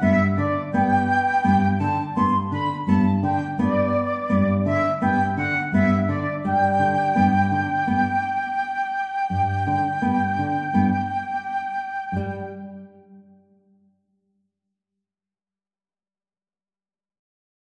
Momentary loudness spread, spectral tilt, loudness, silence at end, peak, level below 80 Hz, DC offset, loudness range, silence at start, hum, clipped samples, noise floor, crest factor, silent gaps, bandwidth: 8 LU; -8.5 dB/octave; -22 LUFS; 4.5 s; -6 dBFS; -54 dBFS; under 0.1%; 10 LU; 0 s; none; under 0.1%; under -90 dBFS; 16 dB; none; 8.4 kHz